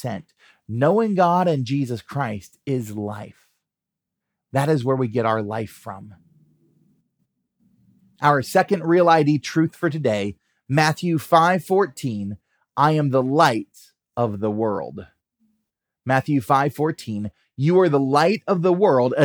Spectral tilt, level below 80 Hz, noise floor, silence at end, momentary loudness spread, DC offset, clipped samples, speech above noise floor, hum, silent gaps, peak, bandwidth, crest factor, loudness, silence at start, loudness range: -6.5 dB/octave; -68 dBFS; -85 dBFS; 0 s; 15 LU; under 0.1%; under 0.1%; 65 dB; none; none; -2 dBFS; over 20 kHz; 20 dB; -20 LUFS; 0.05 s; 7 LU